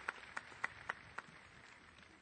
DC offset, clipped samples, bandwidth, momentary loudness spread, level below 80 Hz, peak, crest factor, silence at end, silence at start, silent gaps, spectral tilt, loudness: under 0.1%; under 0.1%; 9 kHz; 14 LU; -74 dBFS; -22 dBFS; 28 dB; 0 s; 0 s; none; -2.5 dB/octave; -49 LUFS